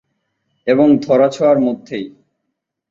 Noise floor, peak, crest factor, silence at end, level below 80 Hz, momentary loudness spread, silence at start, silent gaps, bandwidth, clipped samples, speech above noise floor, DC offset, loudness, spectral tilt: -75 dBFS; -2 dBFS; 14 dB; 0.8 s; -60 dBFS; 15 LU; 0.65 s; none; 7.6 kHz; under 0.1%; 62 dB; under 0.1%; -14 LUFS; -7 dB/octave